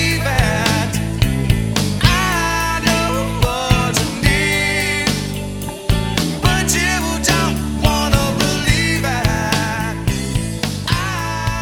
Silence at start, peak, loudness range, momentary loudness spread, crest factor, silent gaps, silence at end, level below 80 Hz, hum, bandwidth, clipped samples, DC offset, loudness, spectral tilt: 0 s; 0 dBFS; 1 LU; 6 LU; 16 dB; none; 0 s; -26 dBFS; none; 19.5 kHz; under 0.1%; under 0.1%; -17 LUFS; -4 dB/octave